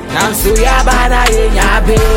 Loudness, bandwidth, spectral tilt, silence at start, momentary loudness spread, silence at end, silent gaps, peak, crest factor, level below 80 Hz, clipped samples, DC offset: -11 LUFS; 17 kHz; -4 dB/octave; 0 s; 1 LU; 0 s; none; 0 dBFS; 10 dB; -12 dBFS; under 0.1%; under 0.1%